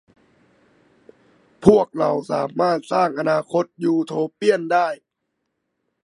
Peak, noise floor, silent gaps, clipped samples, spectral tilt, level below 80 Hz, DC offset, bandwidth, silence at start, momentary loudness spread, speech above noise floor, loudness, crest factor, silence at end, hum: 0 dBFS; -76 dBFS; none; under 0.1%; -6.5 dB/octave; -56 dBFS; under 0.1%; 11.5 kHz; 1.6 s; 9 LU; 57 dB; -20 LUFS; 22 dB; 1.1 s; none